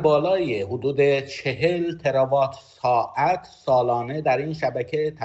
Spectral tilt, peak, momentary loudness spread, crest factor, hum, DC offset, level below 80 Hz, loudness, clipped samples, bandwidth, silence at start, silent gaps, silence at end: -7 dB/octave; -6 dBFS; 6 LU; 16 dB; none; under 0.1%; -58 dBFS; -23 LUFS; under 0.1%; 8.2 kHz; 0 s; none; 0 s